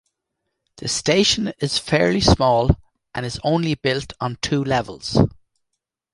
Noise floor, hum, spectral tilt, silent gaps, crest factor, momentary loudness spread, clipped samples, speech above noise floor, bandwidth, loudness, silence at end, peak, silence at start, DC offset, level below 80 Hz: -79 dBFS; none; -4.5 dB/octave; none; 20 dB; 10 LU; under 0.1%; 60 dB; 11.5 kHz; -20 LUFS; 0.85 s; -2 dBFS; 0.8 s; under 0.1%; -36 dBFS